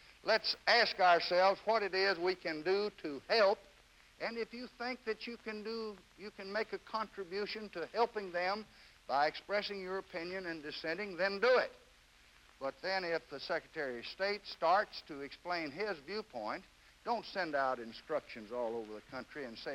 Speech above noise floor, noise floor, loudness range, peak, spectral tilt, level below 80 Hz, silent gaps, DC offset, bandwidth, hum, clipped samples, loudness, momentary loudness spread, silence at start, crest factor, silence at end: 28 dB; -64 dBFS; 8 LU; -16 dBFS; -4 dB/octave; -72 dBFS; none; under 0.1%; 16 kHz; none; under 0.1%; -36 LUFS; 14 LU; 0.25 s; 20 dB; 0 s